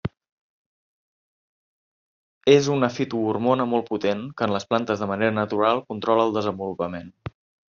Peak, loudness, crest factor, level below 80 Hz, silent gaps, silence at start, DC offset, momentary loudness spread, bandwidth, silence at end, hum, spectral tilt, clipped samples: -2 dBFS; -23 LUFS; 22 dB; -60 dBFS; 0.32-2.41 s; 0.05 s; under 0.1%; 12 LU; 7.2 kHz; 0.4 s; none; -5 dB/octave; under 0.1%